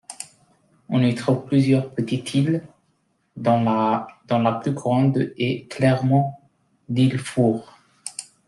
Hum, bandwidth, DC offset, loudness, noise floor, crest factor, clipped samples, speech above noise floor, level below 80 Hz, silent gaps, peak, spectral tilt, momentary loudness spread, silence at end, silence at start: none; 12 kHz; under 0.1%; -22 LUFS; -67 dBFS; 16 dB; under 0.1%; 47 dB; -62 dBFS; none; -6 dBFS; -7 dB/octave; 12 LU; 0.25 s; 0.1 s